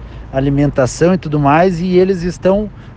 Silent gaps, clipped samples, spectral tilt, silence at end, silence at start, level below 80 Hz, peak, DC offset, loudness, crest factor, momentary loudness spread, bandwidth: none; under 0.1%; -7 dB/octave; 0 s; 0 s; -32 dBFS; 0 dBFS; under 0.1%; -14 LUFS; 14 dB; 6 LU; 9.6 kHz